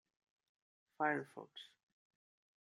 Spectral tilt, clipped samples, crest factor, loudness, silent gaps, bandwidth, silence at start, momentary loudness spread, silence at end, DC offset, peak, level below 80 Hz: -5.5 dB/octave; under 0.1%; 24 dB; -40 LUFS; none; 12 kHz; 1 s; 18 LU; 0.95 s; under 0.1%; -22 dBFS; under -90 dBFS